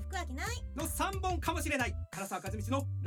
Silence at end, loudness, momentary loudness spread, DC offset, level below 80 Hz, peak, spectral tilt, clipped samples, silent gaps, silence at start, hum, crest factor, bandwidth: 0 s; -36 LUFS; 6 LU; under 0.1%; -42 dBFS; -18 dBFS; -4.5 dB/octave; under 0.1%; none; 0 s; none; 16 dB; 19 kHz